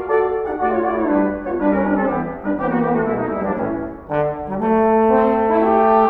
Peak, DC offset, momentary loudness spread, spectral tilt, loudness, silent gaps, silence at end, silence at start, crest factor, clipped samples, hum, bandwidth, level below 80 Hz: -2 dBFS; under 0.1%; 8 LU; -10 dB/octave; -18 LUFS; none; 0 s; 0 s; 16 dB; under 0.1%; none; 4.3 kHz; -42 dBFS